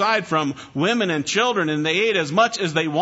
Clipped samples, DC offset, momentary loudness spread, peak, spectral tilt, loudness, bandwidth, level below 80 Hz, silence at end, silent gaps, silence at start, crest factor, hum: under 0.1%; under 0.1%; 4 LU; -4 dBFS; -4 dB/octave; -20 LUFS; 8 kHz; -64 dBFS; 0 s; none; 0 s; 16 dB; none